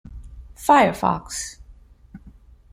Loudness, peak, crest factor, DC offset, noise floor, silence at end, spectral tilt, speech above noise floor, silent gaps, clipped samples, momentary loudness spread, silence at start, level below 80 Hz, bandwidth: -20 LUFS; -4 dBFS; 20 dB; under 0.1%; -48 dBFS; 0.45 s; -4.5 dB/octave; 29 dB; none; under 0.1%; 24 LU; 0.1 s; -44 dBFS; 16 kHz